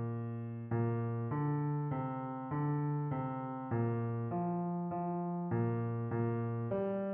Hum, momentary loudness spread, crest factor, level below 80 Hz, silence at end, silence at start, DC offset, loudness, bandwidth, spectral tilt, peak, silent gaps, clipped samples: none; 5 LU; 12 dB; -70 dBFS; 0 s; 0 s; under 0.1%; -37 LUFS; 3.3 kHz; -10.5 dB/octave; -24 dBFS; none; under 0.1%